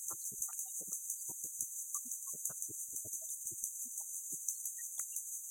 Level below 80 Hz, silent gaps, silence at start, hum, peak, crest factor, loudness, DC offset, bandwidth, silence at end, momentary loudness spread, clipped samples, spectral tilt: -84 dBFS; none; 0 s; none; -18 dBFS; 24 dB; -40 LUFS; under 0.1%; 17 kHz; 0 s; 2 LU; under 0.1%; -1 dB/octave